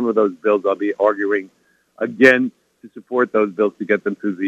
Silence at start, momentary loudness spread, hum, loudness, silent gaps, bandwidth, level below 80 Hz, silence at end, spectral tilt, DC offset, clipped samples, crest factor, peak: 0 s; 11 LU; none; -18 LUFS; none; 9.2 kHz; -68 dBFS; 0 s; -6 dB/octave; under 0.1%; under 0.1%; 18 dB; 0 dBFS